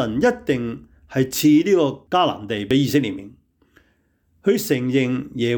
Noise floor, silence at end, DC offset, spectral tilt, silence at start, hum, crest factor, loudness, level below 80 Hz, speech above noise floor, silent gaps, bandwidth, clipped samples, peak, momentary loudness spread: -63 dBFS; 0 s; under 0.1%; -5.5 dB/octave; 0 s; none; 14 dB; -20 LUFS; -54 dBFS; 44 dB; none; 19.5 kHz; under 0.1%; -6 dBFS; 12 LU